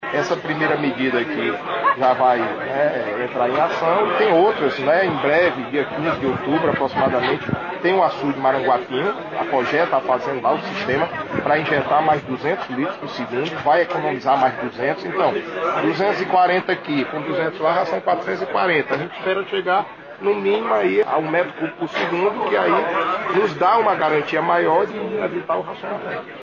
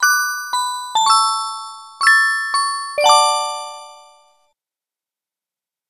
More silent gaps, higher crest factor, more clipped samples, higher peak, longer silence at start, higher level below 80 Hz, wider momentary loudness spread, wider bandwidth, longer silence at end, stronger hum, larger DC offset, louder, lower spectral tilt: neither; about the same, 14 dB vs 18 dB; neither; second, -6 dBFS vs 0 dBFS; about the same, 0 s vs 0 s; first, -60 dBFS vs -74 dBFS; second, 7 LU vs 17 LU; second, 7.2 kHz vs 15 kHz; second, 0 s vs 1.95 s; neither; neither; second, -20 LUFS vs -16 LUFS; first, -6.5 dB/octave vs 3 dB/octave